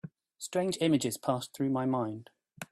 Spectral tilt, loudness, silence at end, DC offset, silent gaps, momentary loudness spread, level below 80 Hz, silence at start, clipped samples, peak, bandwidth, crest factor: -5.5 dB/octave; -31 LUFS; 0.05 s; under 0.1%; none; 18 LU; -72 dBFS; 0.05 s; under 0.1%; -16 dBFS; 15.5 kHz; 18 dB